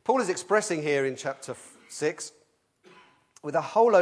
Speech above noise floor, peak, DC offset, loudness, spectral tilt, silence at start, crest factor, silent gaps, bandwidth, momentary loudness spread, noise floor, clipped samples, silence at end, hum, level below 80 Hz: 38 dB; -8 dBFS; under 0.1%; -27 LUFS; -4 dB/octave; 0.05 s; 20 dB; none; 11 kHz; 17 LU; -63 dBFS; under 0.1%; 0 s; none; -82 dBFS